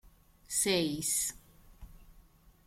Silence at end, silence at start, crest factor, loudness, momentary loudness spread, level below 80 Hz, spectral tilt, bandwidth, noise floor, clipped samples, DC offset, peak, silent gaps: 0.45 s; 0.05 s; 20 dB; -31 LUFS; 6 LU; -58 dBFS; -2.5 dB/octave; 16.5 kHz; -61 dBFS; under 0.1%; under 0.1%; -18 dBFS; none